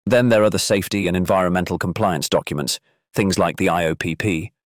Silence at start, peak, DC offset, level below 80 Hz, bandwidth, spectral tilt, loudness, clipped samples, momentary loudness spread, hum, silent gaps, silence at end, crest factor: 0.05 s; -6 dBFS; under 0.1%; -50 dBFS; 19 kHz; -5 dB/octave; -20 LUFS; under 0.1%; 8 LU; none; none; 0.3 s; 12 dB